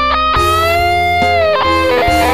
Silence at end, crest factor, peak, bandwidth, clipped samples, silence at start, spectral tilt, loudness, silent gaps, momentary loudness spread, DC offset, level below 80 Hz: 0 s; 12 dB; 0 dBFS; 16 kHz; under 0.1%; 0 s; -4.5 dB/octave; -11 LUFS; none; 1 LU; 2%; -26 dBFS